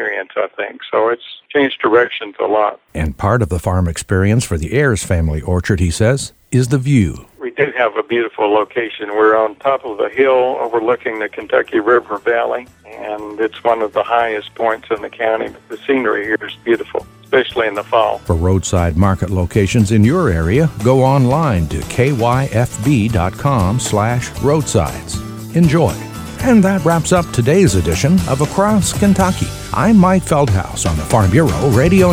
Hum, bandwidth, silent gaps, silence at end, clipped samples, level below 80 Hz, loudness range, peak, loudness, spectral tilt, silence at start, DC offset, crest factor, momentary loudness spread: none; 16.5 kHz; none; 0 s; under 0.1%; -32 dBFS; 4 LU; 0 dBFS; -15 LUFS; -6 dB/octave; 0 s; under 0.1%; 14 dB; 9 LU